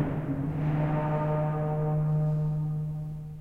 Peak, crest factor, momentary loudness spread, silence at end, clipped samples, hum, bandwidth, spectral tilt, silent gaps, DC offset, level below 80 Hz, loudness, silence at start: -16 dBFS; 12 dB; 6 LU; 0 s; under 0.1%; none; 3.4 kHz; -10.5 dB/octave; none; under 0.1%; -46 dBFS; -29 LUFS; 0 s